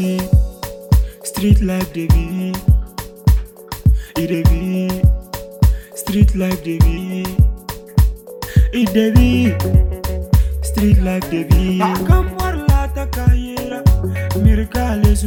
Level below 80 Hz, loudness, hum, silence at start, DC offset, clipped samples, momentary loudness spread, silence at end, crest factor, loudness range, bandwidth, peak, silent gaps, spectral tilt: -18 dBFS; -17 LUFS; none; 0 s; under 0.1%; under 0.1%; 7 LU; 0 s; 14 dB; 2 LU; 17.5 kHz; 0 dBFS; none; -7 dB/octave